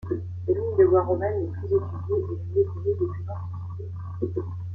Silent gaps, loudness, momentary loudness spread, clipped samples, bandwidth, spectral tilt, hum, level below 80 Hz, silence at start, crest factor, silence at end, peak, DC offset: none; -26 LUFS; 15 LU; under 0.1%; 2.4 kHz; -12 dB/octave; none; -54 dBFS; 0 s; 18 dB; 0 s; -8 dBFS; under 0.1%